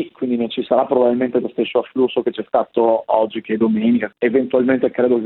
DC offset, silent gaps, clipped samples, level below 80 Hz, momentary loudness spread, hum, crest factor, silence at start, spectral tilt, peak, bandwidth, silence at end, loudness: under 0.1%; none; under 0.1%; -62 dBFS; 5 LU; none; 16 dB; 0 s; -10 dB/octave; 0 dBFS; 4.2 kHz; 0 s; -18 LUFS